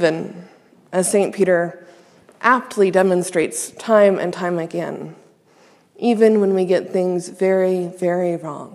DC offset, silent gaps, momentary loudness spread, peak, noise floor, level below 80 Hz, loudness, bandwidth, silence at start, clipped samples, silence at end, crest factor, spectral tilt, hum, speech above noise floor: under 0.1%; none; 12 LU; 0 dBFS; -53 dBFS; -74 dBFS; -18 LUFS; 14 kHz; 0 s; under 0.1%; 0 s; 18 dB; -5.5 dB/octave; none; 35 dB